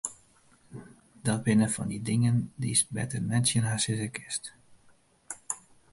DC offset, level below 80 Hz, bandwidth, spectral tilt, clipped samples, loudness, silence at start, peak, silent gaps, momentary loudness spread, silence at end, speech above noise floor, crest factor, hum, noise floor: under 0.1%; -60 dBFS; 11.5 kHz; -4.5 dB/octave; under 0.1%; -29 LUFS; 0.05 s; -12 dBFS; none; 19 LU; 0.35 s; 34 dB; 18 dB; none; -62 dBFS